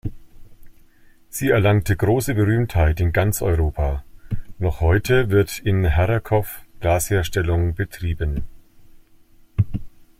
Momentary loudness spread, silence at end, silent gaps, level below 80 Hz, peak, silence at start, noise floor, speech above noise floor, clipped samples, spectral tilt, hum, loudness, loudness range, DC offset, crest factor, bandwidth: 14 LU; 0.3 s; none; -32 dBFS; -4 dBFS; 0.05 s; -50 dBFS; 31 dB; under 0.1%; -6.5 dB/octave; none; -21 LUFS; 4 LU; under 0.1%; 16 dB; 16 kHz